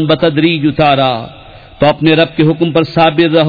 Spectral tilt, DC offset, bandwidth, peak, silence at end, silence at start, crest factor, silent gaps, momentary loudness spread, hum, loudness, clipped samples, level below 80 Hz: -8.5 dB/octave; under 0.1%; 5 kHz; 0 dBFS; 0 s; 0 s; 10 dB; none; 4 LU; none; -11 LUFS; under 0.1%; -40 dBFS